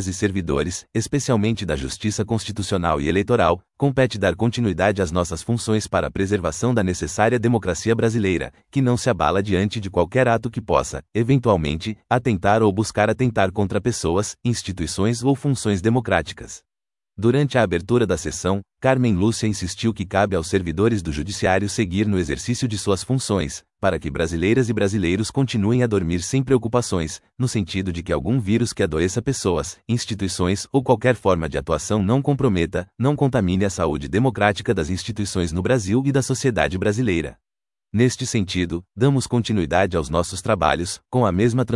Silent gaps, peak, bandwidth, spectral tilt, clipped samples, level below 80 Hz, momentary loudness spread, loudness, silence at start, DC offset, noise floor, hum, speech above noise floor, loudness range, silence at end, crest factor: none; 0 dBFS; 12 kHz; -5.5 dB/octave; under 0.1%; -44 dBFS; 6 LU; -21 LUFS; 0 s; under 0.1%; -64 dBFS; none; 43 dB; 2 LU; 0 s; 20 dB